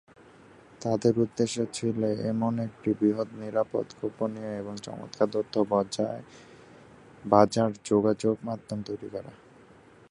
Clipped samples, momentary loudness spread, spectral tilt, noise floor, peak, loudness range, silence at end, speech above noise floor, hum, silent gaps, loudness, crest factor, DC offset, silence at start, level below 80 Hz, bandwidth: under 0.1%; 13 LU; -6.5 dB/octave; -54 dBFS; -4 dBFS; 4 LU; 0.75 s; 27 dB; none; none; -28 LUFS; 24 dB; under 0.1%; 0.8 s; -64 dBFS; 11 kHz